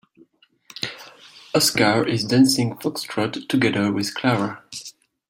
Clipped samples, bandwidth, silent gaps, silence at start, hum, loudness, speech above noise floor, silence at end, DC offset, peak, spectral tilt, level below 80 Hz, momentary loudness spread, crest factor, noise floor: under 0.1%; 16.5 kHz; none; 0.75 s; none; -21 LUFS; 36 dB; 0.4 s; under 0.1%; -4 dBFS; -4 dB/octave; -60 dBFS; 18 LU; 20 dB; -56 dBFS